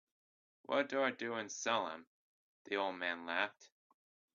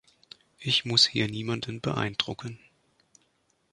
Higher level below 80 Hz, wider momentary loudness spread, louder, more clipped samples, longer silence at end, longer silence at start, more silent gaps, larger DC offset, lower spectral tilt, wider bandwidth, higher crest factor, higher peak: second, -88 dBFS vs -62 dBFS; second, 6 LU vs 16 LU; second, -38 LUFS vs -26 LUFS; neither; second, 0.7 s vs 1.15 s; about the same, 0.7 s vs 0.6 s; first, 2.07-2.65 s vs none; neither; second, -0.5 dB/octave vs -3.5 dB/octave; second, 7.2 kHz vs 11.5 kHz; about the same, 24 dB vs 24 dB; second, -18 dBFS vs -6 dBFS